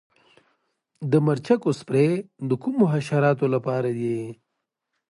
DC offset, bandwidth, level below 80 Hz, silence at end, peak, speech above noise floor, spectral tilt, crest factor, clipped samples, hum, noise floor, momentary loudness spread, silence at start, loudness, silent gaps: under 0.1%; 11.5 kHz; -68 dBFS; 0.75 s; -6 dBFS; 58 dB; -8 dB/octave; 18 dB; under 0.1%; none; -81 dBFS; 7 LU; 1 s; -23 LUFS; none